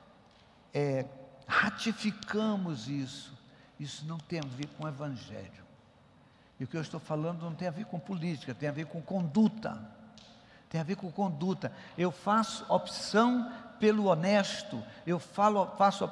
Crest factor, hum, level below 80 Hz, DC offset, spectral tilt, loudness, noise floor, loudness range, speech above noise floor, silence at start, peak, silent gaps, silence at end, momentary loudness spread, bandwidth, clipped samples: 20 dB; none; -72 dBFS; under 0.1%; -6 dB/octave; -32 LUFS; -61 dBFS; 11 LU; 29 dB; 0.75 s; -12 dBFS; none; 0 s; 14 LU; 12 kHz; under 0.1%